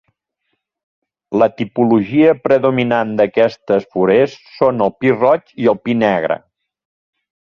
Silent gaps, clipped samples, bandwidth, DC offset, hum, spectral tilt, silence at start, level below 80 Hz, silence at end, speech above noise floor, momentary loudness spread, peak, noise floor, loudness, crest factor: none; under 0.1%; 7 kHz; under 0.1%; none; -8 dB/octave; 1.3 s; -56 dBFS; 1.2 s; 58 dB; 5 LU; -2 dBFS; -72 dBFS; -15 LUFS; 14 dB